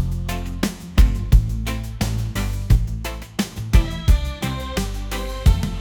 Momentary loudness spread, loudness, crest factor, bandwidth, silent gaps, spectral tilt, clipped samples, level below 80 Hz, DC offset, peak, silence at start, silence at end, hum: 8 LU; -22 LUFS; 18 dB; 19 kHz; none; -5.5 dB/octave; under 0.1%; -22 dBFS; under 0.1%; -2 dBFS; 0 s; 0 s; none